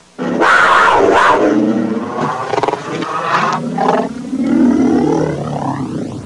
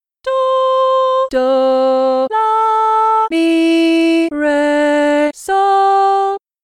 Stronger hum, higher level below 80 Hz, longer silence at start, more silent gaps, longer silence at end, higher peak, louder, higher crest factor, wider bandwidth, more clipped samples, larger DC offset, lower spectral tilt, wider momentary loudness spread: neither; first, -48 dBFS vs -54 dBFS; about the same, 0.2 s vs 0.25 s; neither; second, 0 s vs 0.25 s; about the same, -2 dBFS vs -4 dBFS; about the same, -13 LUFS vs -13 LUFS; about the same, 12 dB vs 8 dB; second, 11.5 kHz vs 13 kHz; neither; neither; first, -5.5 dB/octave vs -3 dB/octave; first, 11 LU vs 3 LU